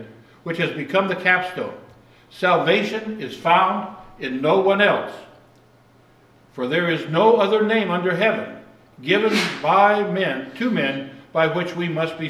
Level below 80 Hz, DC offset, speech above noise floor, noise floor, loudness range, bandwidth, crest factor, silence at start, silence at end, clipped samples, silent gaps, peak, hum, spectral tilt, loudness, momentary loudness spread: -64 dBFS; under 0.1%; 33 dB; -53 dBFS; 3 LU; 14 kHz; 20 dB; 0 s; 0 s; under 0.1%; none; -2 dBFS; none; -5.5 dB/octave; -20 LUFS; 14 LU